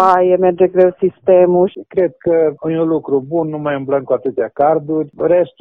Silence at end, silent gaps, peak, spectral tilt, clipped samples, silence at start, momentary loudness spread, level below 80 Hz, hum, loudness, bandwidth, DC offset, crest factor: 0.1 s; none; 0 dBFS; -9.5 dB/octave; under 0.1%; 0 s; 7 LU; -58 dBFS; none; -15 LUFS; 5.2 kHz; under 0.1%; 14 dB